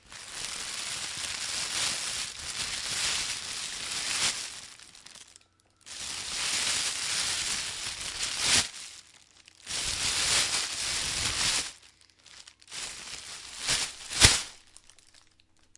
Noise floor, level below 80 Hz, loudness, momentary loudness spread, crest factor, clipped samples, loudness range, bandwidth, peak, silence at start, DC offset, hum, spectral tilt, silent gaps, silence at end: -63 dBFS; -50 dBFS; -28 LUFS; 19 LU; 30 dB; under 0.1%; 4 LU; 11.5 kHz; -2 dBFS; 0.05 s; under 0.1%; none; 0 dB/octave; none; 0.6 s